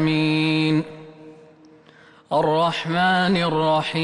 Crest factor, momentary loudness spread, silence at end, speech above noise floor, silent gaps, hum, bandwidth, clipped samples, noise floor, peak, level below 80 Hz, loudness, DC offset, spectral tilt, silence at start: 12 dB; 6 LU; 0 s; 31 dB; none; none; 11 kHz; under 0.1%; -50 dBFS; -10 dBFS; -58 dBFS; -20 LUFS; under 0.1%; -6.5 dB/octave; 0 s